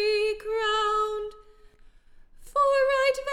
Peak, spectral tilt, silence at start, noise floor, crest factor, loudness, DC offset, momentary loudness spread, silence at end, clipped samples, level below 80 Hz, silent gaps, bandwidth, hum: -14 dBFS; -1 dB/octave; 0 s; -53 dBFS; 14 dB; -25 LUFS; under 0.1%; 9 LU; 0 s; under 0.1%; -52 dBFS; none; 13.5 kHz; none